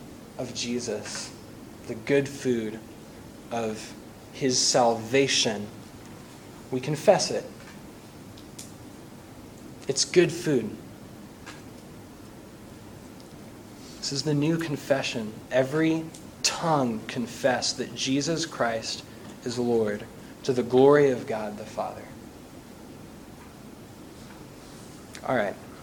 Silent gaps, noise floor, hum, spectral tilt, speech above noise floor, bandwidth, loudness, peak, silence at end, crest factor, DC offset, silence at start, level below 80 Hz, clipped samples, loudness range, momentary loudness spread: none; -45 dBFS; none; -4 dB/octave; 20 dB; 19 kHz; -26 LUFS; -4 dBFS; 0 s; 24 dB; under 0.1%; 0 s; -58 dBFS; under 0.1%; 11 LU; 23 LU